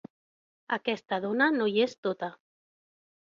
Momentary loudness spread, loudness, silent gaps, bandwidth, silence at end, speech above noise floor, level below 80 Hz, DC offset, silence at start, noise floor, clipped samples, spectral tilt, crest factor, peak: 10 LU; -29 LUFS; 1.98-2.03 s; 7.4 kHz; 0.95 s; over 62 dB; -78 dBFS; under 0.1%; 0.7 s; under -90 dBFS; under 0.1%; -5.5 dB/octave; 20 dB; -12 dBFS